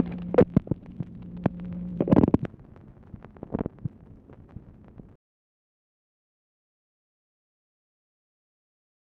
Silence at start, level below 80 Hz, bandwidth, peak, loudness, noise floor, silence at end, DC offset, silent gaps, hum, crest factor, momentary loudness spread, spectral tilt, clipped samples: 0 s; -48 dBFS; 5.2 kHz; -8 dBFS; -26 LUFS; -50 dBFS; 4.8 s; under 0.1%; none; none; 22 dB; 26 LU; -11 dB/octave; under 0.1%